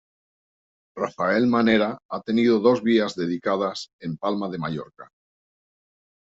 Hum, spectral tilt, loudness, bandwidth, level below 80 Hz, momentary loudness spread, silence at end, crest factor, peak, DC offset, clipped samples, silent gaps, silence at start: none; -6.5 dB/octave; -23 LUFS; 7.8 kHz; -64 dBFS; 14 LU; 1.35 s; 18 dB; -6 dBFS; under 0.1%; under 0.1%; 2.05-2.09 s, 3.93-3.99 s; 0.95 s